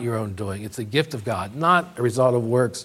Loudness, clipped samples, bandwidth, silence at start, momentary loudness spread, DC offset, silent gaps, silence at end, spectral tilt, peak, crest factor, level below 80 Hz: -23 LUFS; under 0.1%; 15.5 kHz; 0 s; 11 LU; under 0.1%; none; 0 s; -6 dB/octave; -4 dBFS; 18 dB; -60 dBFS